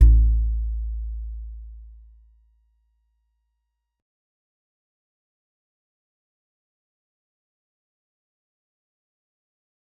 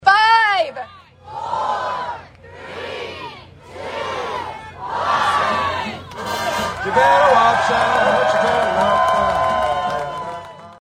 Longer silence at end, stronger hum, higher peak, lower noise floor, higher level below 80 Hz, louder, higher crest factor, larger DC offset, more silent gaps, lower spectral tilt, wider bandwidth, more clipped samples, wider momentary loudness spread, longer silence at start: first, 8.1 s vs 0.05 s; neither; about the same, -2 dBFS vs 0 dBFS; first, -78 dBFS vs -40 dBFS; first, -26 dBFS vs -48 dBFS; second, -25 LUFS vs -17 LUFS; first, 24 dB vs 18 dB; neither; neither; first, -11.5 dB/octave vs -3.5 dB/octave; second, 0.4 kHz vs 16 kHz; neither; first, 24 LU vs 20 LU; about the same, 0 s vs 0 s